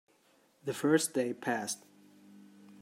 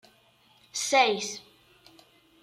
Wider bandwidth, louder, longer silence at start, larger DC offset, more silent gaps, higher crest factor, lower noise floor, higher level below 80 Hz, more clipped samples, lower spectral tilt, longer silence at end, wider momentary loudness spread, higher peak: about the same, 16 kHz vs 15.5 kHz; second, -33 LUFS vs -26 LUFS; about the same, 0.65 s vs 0.75 s; neither; neither; about the same, 22 dB vs 22 dB; first, -68 dBFS vs -62 dBFS; second, -84 dBFS vs -78 dBFS; neither; first, -4 dB/octave vs -1 dB/octave; second, 0.1 s vs 1.05 s; about the same, 13 LU vs 15 LU; second, -14 dBFS vs -10 dBFS